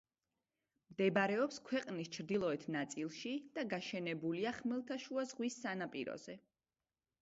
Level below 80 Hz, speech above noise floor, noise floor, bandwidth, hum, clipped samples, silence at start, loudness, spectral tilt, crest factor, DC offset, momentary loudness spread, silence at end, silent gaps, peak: -82 dBFS; over 50 dB; under -90 dBFS; 7.6 kHz; none; under 0.1%; 0.9 s; -40 LUFS; -4 dB/octave; 20 dB; under 0.1%; 9 LU; 0.8 s; none; -22 dBFS